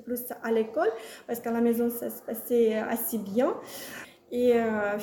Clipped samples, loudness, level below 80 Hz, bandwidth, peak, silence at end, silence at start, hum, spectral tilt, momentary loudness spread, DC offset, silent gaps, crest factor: under 0.1%; -28 LUFS; -68 dBFS; 19 kHz; -14 dBFS; 0 s; 0 s; none; -5 dB/octave; 13 LU; under 0.1%; none; 14 dB